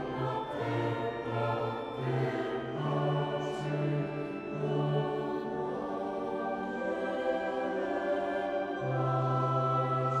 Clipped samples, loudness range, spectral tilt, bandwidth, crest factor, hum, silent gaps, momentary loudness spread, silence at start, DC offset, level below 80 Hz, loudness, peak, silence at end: under 0.1%; 2 LU; -8 dB/octave; 9 kHz; 14 dB; none; none; 6 LU; 0 s; under 0.1%; -64 dBFS; -33 LUFS; -18 dBFS; 0 s